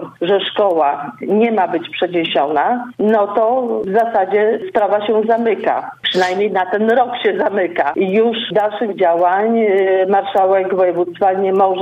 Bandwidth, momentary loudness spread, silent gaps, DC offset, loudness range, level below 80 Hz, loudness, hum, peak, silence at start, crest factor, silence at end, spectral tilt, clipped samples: 8.4 kHz; 4 LU; none; under 0.1%; 1 LU; -64 dBFS; -15 LUFS; none; -4 dBFS; 0 s; 12 dB; 0 s; -6 dB/octave; under 0.1%